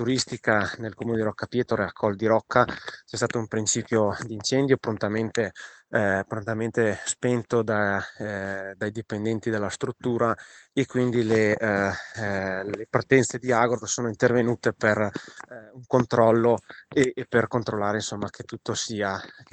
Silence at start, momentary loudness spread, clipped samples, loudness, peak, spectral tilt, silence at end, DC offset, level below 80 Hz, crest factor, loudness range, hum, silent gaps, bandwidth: 0 s; 10 LU; under 0.1%; -25 LUFS; -4 dBFS; -5 dB/octave; 0.1 s; under 0.1%; -62 dBFS; 22 dB; 3 LU; none; none; 9.4 kHz